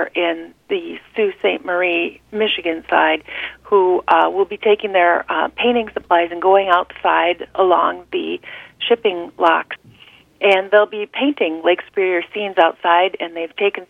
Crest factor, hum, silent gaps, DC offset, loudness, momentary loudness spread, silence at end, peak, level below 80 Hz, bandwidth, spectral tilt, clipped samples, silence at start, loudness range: 18 dB; none; none; under 0.1%; -17 LUFS; 10 LU; 0.05 s; 0 dBFS; -58 dBFS; 5.4 kHz; -5.5 dB/octave; under 0.1%; 0 s; 3 LU